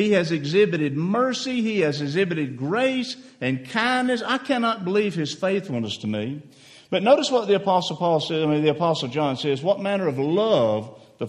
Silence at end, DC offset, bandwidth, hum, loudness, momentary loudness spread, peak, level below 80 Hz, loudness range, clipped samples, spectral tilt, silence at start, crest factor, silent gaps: 0 s; under 0.1%; 11 kHz; none; -23 LUFS; 8 LU; -4 dBFS; -66 dBFS; 2 LU; under 0.1%; -5.5 dB/octave; 0 s; 18 dB; none